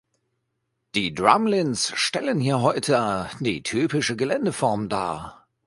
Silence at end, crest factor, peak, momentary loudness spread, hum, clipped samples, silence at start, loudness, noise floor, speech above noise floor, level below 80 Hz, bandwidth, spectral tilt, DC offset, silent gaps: 0.35 s; 22 dB; 0 dBFS; 8 LU; none; under 0.1%; 0.95 s; -23 LUFS; -76 dBFS; 54 dB; -56 dBFS; 11.5 kHz; -4.5 dB/octave; under 0.1%; none